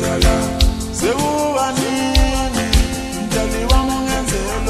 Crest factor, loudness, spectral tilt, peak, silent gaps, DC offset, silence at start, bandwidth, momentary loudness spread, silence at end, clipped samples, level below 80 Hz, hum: 14 dB; -17 LUFS; -4.5 dB/octave; -2 dBFS; none; under 0.1%; 0 s; 13.5 kHz; 4 LU; 0 s; under 0.1%; -20 dBFS; none